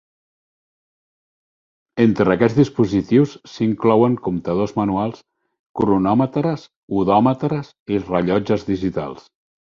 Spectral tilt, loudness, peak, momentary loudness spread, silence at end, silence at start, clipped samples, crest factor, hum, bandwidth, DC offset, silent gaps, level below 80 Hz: -8.5 dB/octave; -19 LUFS; -2 dBFS; 10 LU; 0.55 s; 1.95 s; under 0.1%; 18 dB; none; 7.4 kHz; under 0.1%; 5.59-5.74 s, 6.76-6.88 s, 7.80-7.86 s; -48 dBFS